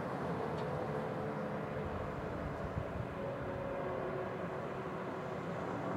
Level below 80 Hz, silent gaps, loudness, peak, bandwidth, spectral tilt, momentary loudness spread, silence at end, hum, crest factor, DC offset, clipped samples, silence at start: -56 dBFS; none; -40 LUFS; -24 dBFS; 16 kHz; -7.5 dB/octave; 3 LU; 0 s; none; 16 dB; under 0.1%; under 0.1%; 0 s